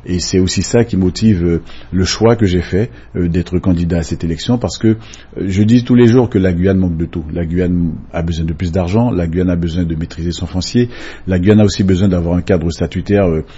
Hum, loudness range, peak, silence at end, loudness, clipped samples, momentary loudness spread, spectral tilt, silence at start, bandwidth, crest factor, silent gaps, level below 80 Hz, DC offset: none; 3 LU; 0 dBFS; 0 s; -14 LUFS; under 0.1%; 10 LU; -6.5 dB/octave; 0 s; 8 kHz; 14 dB; none; -30 dBFS; under 0.1%